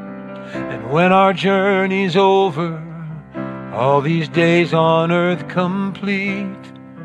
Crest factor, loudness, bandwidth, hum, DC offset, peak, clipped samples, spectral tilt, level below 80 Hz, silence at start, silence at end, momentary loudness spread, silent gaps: 16 dB; -16 LUFS; 9.2 kHz; none; under 0.1%; 0 dBFS; under 0.1%; -7 dB/octave; -56 dBFS; 0 s; 0 s; 16 LU; none